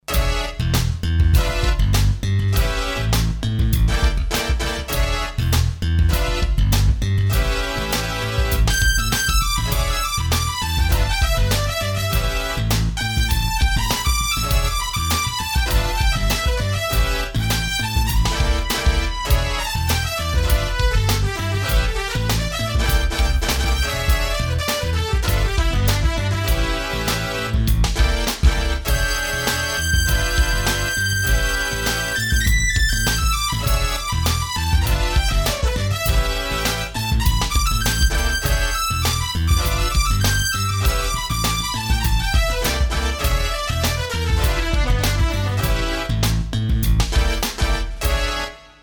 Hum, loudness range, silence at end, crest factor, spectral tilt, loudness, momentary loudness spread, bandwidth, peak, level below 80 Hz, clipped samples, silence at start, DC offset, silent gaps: none; 1 LU; 0.15 s; 16 dB; -3.5 dB/octave; -20 LUFS; 3 LU; over 20 kHz; -2 dBFS; -22 dBFS; under 0.1%; 0.1 s; under 0.1%; none